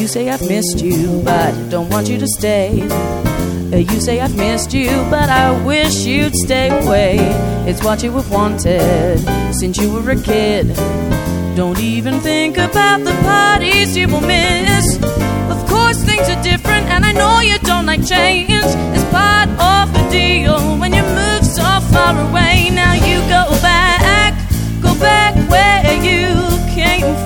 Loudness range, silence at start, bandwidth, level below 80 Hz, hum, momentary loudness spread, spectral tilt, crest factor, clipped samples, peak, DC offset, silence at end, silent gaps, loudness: 4 LU; 0 s; 17.5 kHz; -22 dBFS; none; 6 LU; -4.5 dB/octave; 12 dB; under 0.1%; 0 dBFS; under 0.1%; 0 s; none; -13 LUFS